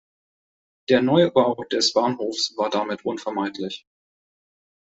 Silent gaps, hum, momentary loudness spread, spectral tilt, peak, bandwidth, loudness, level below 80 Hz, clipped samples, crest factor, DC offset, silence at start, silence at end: none; none; 14 LU; -4.5 dB/octave; -4 dBFS; 8.2 kHz; -22 LUFS; -66 dBFS; under 0.1%; 20 dB; under 0.1%; 0.9 s; 1.1 s